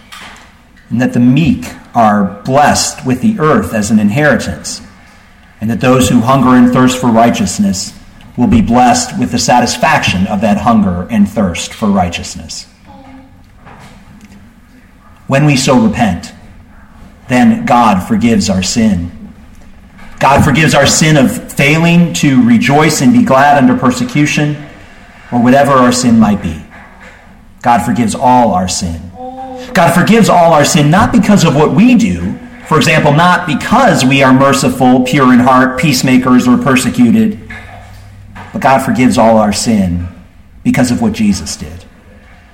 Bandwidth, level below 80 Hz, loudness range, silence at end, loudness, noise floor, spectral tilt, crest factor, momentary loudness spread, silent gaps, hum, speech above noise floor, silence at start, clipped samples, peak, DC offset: 16.5 kHz; -34 dBFS; 6 LU; 0.7 s; -9 LUFS; -40 dBFS; -5 dB/octave; 10 dB; 14 LU; none; none; 31 dB; 0.1 s; under 0.1%; 0 dBFS; under 0.1%